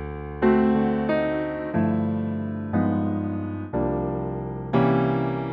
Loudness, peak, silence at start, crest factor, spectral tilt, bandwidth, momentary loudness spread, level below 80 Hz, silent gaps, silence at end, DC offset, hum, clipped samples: -24 LUFS; -8 dBFS; 0 s; 16 dB; -11 dB/octave; 5 kHz; 9 LU; -44 dBFS; none; 0 s; under 0.1%; none; under 0.1%